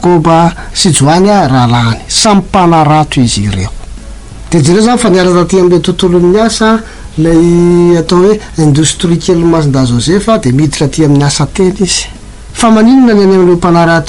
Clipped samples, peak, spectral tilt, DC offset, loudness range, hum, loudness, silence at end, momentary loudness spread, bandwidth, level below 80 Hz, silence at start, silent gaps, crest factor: under 0.1%; 0 dBFS; -5.5 dB/octave; 0.5%; 2 LU; none; -7 LUFS; 0 s; 5 LU; 11.5 kHz; -26 dBFS; 0 s; none; 8 dB